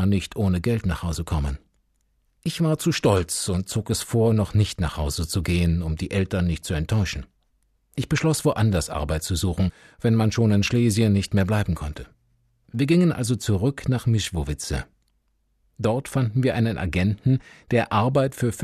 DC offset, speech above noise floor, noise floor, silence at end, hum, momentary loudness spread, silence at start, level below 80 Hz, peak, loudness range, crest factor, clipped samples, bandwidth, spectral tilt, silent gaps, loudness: under 0.1%; 46 dB; -68 dBFS; 0 s; none; 8 LU; 0 s; -38 dBFS; -6 dBFS; 3 LU; 16 dB; under 0.1%; 14 kHz; -6 dB/octave; none; -23 LUFS